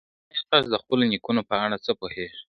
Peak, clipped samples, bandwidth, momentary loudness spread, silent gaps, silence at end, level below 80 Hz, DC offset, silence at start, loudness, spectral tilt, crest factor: -2 dBFS; under 0.1%; 6.2 kHz; 11 LU; none; 0.1 s; -60 dBFS; under 0.1%; 0.35 s; -25 LUFS; -6.5 dB/octave; 24 dB